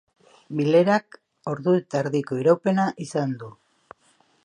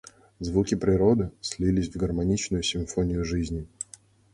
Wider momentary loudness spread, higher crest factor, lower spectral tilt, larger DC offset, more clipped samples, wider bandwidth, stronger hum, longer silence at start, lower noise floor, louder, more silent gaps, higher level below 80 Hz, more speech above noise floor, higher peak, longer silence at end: about the same, 14 LU vs 13 LU; about the same, 18 dB vs 18 dB; first, -7 dB/octave vs -5.5 dB/octave; neither; neither; about the same, 10.5 kHz vs 11.5 kHz; neither; about the same, 0.5 s vs 0.4 s; first, -62 dBFS vs -53 dBFS; first, -23 LUFS vs -26 LUFS; neither; second, -72 dBFS vs -40 dBFS; first, 40 dB vs 28 dB; about the same, -6 dBFS vs -8 dBFS; first, 0.95 s vs 0.5 s